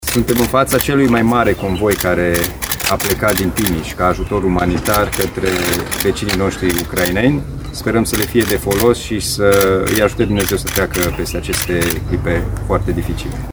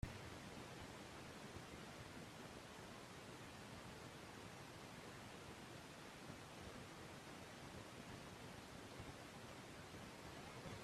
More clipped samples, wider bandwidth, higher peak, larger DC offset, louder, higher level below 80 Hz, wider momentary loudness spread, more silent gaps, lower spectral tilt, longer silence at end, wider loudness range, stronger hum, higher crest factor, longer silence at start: neither; first, over 20 kHz vs 15 kHz; first, 0 dBFS vs -30 dBFS; neither; first, -15 LUFS vs -56 LUFS; first, -28 dBFS vs -70 dBFS; first, 6 LU vs 1 LU; neither; about the same, -4.5 dB/octave vs -4 dB/octave; about the same, 0 s vs 0 s; about the same, 2 LU vs 1 LU; neither; second, 16 dB vs 24 dB; about the same, 0 s vs 0 s